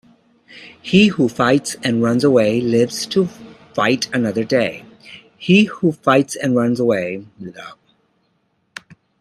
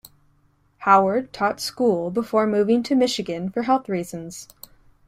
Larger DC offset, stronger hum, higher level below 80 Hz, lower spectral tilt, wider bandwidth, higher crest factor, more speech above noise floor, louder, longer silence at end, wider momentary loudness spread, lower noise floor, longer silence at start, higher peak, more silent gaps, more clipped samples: neither; neither; about the same, -58 dBFS vs -60 dBFS; about the same, -5.5 dB/octave vs -5 dB/octave; second, 14.5 kHz vs 16 kHz; about the same, 18 dB vs 20 dB; first, 48 dB vs 40 dB; first, -17 LUFS vs -21 LUFS; first, 1.5 s vs 0.65 s; first, 21 LU vs 16 LU; first, -65 dBFS vs -61 dBFS; second, 0.55 s vs 0.8 s; about the same, 0 dBFS vs -2 dBFS; neither; neither